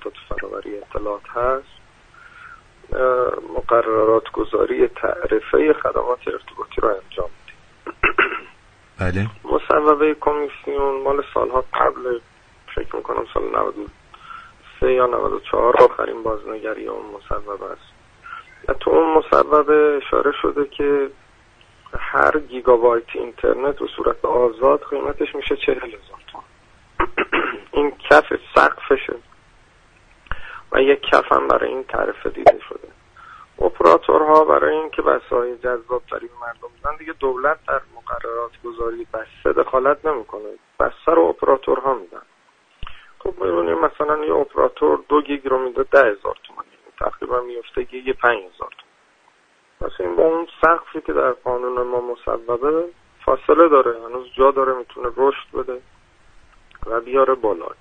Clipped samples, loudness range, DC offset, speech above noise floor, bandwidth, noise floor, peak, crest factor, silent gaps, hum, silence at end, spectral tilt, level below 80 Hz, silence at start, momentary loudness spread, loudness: under 0.1%; 6 LU; under 0.1%; 39 dB; 9 kHz; -57 dBFS; 0 dBFS; 20 dB; none; none; 0.1 s; -6.5 dB/octave; -42 dBFS; 0 s; 17 LU; -19 LUFS